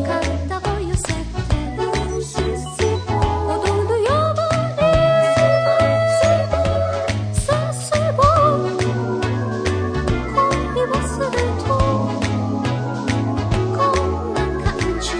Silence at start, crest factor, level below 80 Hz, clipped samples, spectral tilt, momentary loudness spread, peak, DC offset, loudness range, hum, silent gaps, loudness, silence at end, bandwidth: 0 s; 18 dB; -30 dBFS; under 0.1%; -6 dB/octave; 7 LU; 0 dBFS; under 0.1%; 4 LU; none; none; -19 LUFS; 0 s; 10.5 kHz